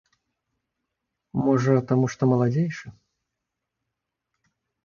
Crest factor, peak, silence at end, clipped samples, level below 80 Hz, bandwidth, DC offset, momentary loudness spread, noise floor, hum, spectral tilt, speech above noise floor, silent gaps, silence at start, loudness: 20 dB; -6 dBFS; 1.95 s; under 0.1%; -62 dBFS; 7.2 kHz; under 0.1%; 9 LU; -83 dBFS; none; -8 dB/octave; 62 dB; none; 1.35 s; -23 LUFS